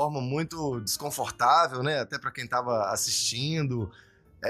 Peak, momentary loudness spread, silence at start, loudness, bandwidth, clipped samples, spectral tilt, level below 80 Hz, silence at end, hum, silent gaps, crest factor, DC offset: -10 dBFS; 10 LU; 0 s; -27 LUFS; 15.5 kHz; under 0.1%; -3.5 dB/octave; -60 dBFS; 0 s; none; none; 18 dB; under 0.1%